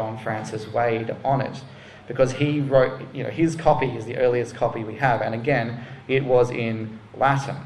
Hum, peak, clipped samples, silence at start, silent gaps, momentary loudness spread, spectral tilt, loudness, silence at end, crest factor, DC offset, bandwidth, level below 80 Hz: none; -4 dBFS; under 0.1%; 0 s; none; 12 LU; -7 dB/octave; -23 LUFS; 0 s; 20 dB; under 0.1%; 11.5 kHz; -50 dBFS